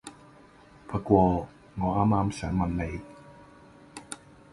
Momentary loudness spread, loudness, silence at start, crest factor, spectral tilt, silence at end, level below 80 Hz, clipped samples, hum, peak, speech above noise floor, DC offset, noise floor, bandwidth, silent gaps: 24 LU; -27 LUFS; 0.05 s; 24 dB; -7.5 dB/octave; 0.4 s; -44 dBFS; under 0.1%; none; -6 dBFS; 28 dB; under 0.1%; -54 dBFS; 11.5 kHz; none